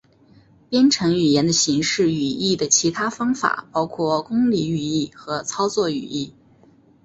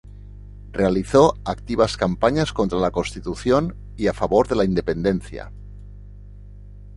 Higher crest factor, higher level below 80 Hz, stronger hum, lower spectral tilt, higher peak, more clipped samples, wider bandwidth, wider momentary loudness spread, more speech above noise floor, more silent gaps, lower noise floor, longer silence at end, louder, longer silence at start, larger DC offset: about the same, 18 dB vs 20 dB; second, -56 dBFS vs -38 dBFS; second, none vs 50 Hz at -35 dBFS; second, -3.5 dB/octave vs -6.5 dB/octave; about the same, -2 dBFS vs -2 dBFS; neither; second, 8.2 kHz vs 11.5 kHz; second, 10 LU vs 19 LU; first, 33 dB vs 20 dB; neither; first, -53 dBFS vs -40 dBFS; first, 0.75 s vs 0 s; about the same, -20 LUFS vs -21 LUFS; first, 0.7 s vs 0.05 s; neither